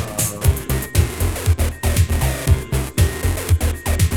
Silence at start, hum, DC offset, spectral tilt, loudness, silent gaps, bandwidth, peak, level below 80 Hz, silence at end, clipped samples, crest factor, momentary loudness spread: 0 s; none; 0.4%; -5 dB/octave; -19 LUFS; none; 19 kHz; -2 dBFS; -22 dBFS; 0 s; under 0.1%; 16 dB; 3 LU